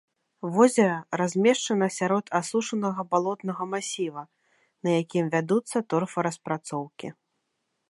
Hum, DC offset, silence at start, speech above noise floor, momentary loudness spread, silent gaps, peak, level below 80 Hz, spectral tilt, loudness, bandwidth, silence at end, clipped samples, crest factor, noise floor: none; under 0.1%; 0.45 s; 52 dB; 12 LU; none; -4 dBFS; -78 dBFS; -5 dB/octave; -26 LUFS; 11.5 kHz; 0.8 s; under 0.1%; 22 dB; -78 dBFS